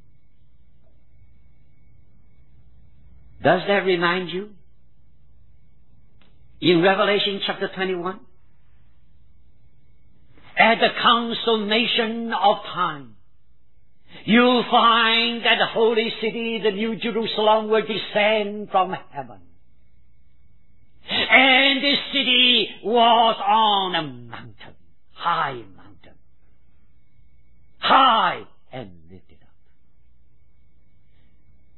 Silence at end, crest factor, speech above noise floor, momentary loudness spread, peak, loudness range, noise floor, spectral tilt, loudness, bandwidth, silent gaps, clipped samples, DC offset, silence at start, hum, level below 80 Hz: 2.6 s; 22 dB; 43 dB; 18 LU; 0 dBFS; 9 LU; -62 dBFS; -7 dB/octave; -19 LUFS; 4.3 kHz; none; under 0.1%; 0.8%; 3.4 s; none; -60 dBFS